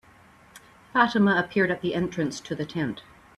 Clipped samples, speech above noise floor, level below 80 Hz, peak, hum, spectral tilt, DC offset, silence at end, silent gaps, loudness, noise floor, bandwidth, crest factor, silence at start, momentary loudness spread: under 0.1%; 30 dB; -60 dBFS; -6 dBFS; none; -6 dB/octave; under 0.1%; 0.35 s; none; -25 LUFS; -54 dBFS; 12 kHz; 22 dB; 0.55 s; 11 LU